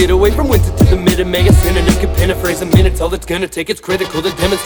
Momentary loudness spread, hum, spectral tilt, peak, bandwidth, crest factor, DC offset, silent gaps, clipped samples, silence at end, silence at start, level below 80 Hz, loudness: 8 LU; none; -5.5 dB/octave; 0 dBFS; over 20 kHz; 12 dB; under 0.1%; none; under 0.1%; 0 s; 0 s; -18 dBFS; -13 LUFS